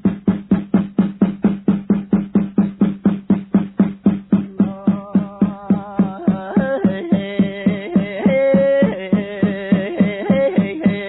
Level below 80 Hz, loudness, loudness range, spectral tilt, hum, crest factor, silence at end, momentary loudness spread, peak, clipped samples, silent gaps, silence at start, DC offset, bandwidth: -48 dBFS; -18 LUFS; 2 LU; -12.5 dB/octave; none; 16 dB; 0 s; 5 LU; -2 dBFS; under 0.1%; none; 0.05 s; under 0.1%; 4.1 kHz